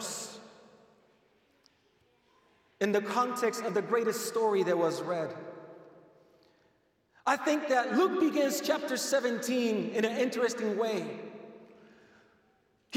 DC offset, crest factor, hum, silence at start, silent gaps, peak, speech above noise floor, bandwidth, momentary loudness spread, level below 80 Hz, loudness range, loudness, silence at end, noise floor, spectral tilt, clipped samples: under 0.1%; 20 dB; none; 0 s; none; -12 dBFS; 41 dB; 17 kHz; 16 LU; -84 dBFS; 5 LU; -30 LUFS; 0 s; -70 dBFS; -4 dB/octave; under 0.1%